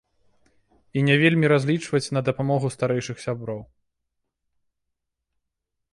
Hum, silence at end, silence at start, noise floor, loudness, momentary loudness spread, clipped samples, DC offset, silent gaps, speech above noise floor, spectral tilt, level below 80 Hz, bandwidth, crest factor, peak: none; 2.3 s; 0.95 s; -81 dBFS; -22 LUFS; 13 LU; under 0.1%; under 0.1%; none; 59 dB; -6 dB/octave; -62 dBFS; 11.5 kHz; 20 dB; -6 dBFS